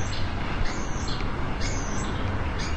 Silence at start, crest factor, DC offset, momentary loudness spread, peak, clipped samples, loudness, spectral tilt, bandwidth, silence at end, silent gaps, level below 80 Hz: 0 s; 12 dB; 1%; 1 LU; -14 dBFS; under 0.1%; -30 LUFS; -4.5 dB/octave; 9 kHz; 0 s; none; -32 dBFS